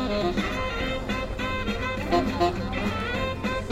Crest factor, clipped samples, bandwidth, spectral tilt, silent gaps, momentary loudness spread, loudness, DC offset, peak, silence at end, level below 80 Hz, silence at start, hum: 16 dB; under 0.1%; 16 kHz; -5.5 dB/octave; none; 4 LU; -27 LUFS; under 0.1%; -10 dBFS; 0 s; -36 dBFS; 0 s; none